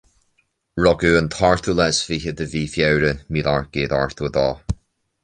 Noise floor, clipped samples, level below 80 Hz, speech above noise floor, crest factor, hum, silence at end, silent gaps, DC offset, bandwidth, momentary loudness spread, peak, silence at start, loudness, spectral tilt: -67 dBFS; under 0.1%; -38 dBFS; 47 dB; 18 dB; none; 0.5 s; none; under 0.1%; 10 kHz; 9 LU; -2 dBFS; 0.75 s; -20 LUFS; -5 dB/octave